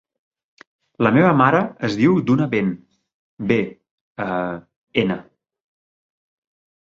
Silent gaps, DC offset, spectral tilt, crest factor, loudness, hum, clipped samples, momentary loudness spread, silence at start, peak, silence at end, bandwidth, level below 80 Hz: 3.14-3.37 s, 3.91-4.15 s, 4.76-4.87 s; under 0.1%; -8 dB/octave; 20 dB; -19 LUFS; none; under 0.1%; 16 LU; 1 s; -2 dBFS; 1.6 s; 7.6 kHz; -58 dBFS